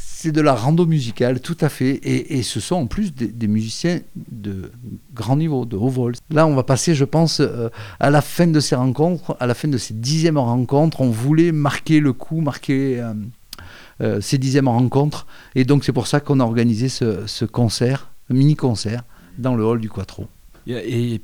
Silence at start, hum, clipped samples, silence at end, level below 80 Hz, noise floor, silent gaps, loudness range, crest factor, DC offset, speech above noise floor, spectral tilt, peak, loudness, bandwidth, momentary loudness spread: 0 s; none; under 0.1%; 0 s; -46 dBFS; -39 dBFS; none; 4 LU; 16 dB; under 0.1%; 21 dB; -6.5 dB/octave; -2 dBFS; -19 LUFS; 18 kHz; 13 LU